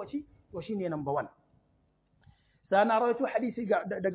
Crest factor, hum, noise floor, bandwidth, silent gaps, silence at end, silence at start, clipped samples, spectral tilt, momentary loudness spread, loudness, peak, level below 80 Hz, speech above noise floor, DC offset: 20 dB; none; -70 dBFS; 4 kHz; none; 0 s; 0 s; under 0.1%; -5 dB/octave; 16 LU; -30 LUFS; -12 dBFS; -66 dBFS; 41 dB; under 0.1%